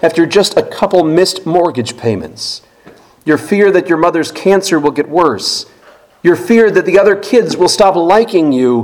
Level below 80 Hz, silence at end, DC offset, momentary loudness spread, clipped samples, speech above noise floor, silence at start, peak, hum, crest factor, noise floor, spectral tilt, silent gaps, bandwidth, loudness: -48 dBFS; 0 s; under 0.1%; 9 LU; 0.5%; 33 dB; 0 s; 0 dBFS; none; 12 dB; -43 dBFS; -4.5 dB/octave; none; 17.5 kHz; -11 LUFS